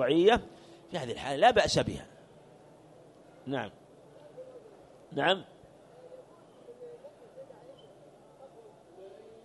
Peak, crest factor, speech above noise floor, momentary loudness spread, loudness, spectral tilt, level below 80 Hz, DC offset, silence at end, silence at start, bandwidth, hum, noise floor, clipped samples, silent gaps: -10 dBFS; 24 dB; 28 dB; 29 LU; -29 LUFS; -4.5 dB/octave; -58 dBFS; under 0.1%; 0.35 s; 0 s; 11.5 kHz; none; -56 dBFS; under 0.1%; none